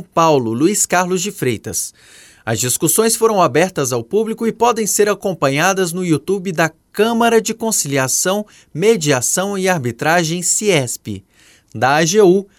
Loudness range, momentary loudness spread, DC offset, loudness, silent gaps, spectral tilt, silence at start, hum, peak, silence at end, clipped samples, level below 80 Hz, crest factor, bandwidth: 1 LU; 8 LU; under 0.1%; -15 LUFS; none; -3.5 dB/octave; 0 s; none; 0 dBFS; 0.15 s; under 0.1%; -56 dBFS; 14 dB; 17.5 kHz